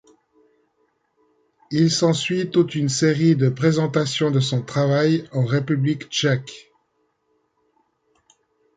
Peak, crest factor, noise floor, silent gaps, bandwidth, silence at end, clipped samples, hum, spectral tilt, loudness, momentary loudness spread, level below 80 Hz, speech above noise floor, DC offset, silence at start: -4 dBFS; 18 dB; -69 dBFS; none; 9.4 kHz; 2.2 s; under 0.1%; none; -5.5 dB/octave; -20 LUFS; 5 LU; -62 dBFS; 50 dB; under 0.1%; 1.7 s